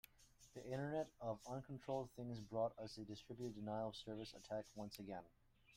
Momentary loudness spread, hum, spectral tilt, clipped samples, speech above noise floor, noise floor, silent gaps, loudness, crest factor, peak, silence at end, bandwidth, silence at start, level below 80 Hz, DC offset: 9 LU; none; -6 dB/octave; under 0.1%; 22 dB; -70 dBFS; none; -49 LUFS; 18 dB; -32 dBFS; 0 s; 16 kHz; 0.2 s; -74 dBFS; under 0.1%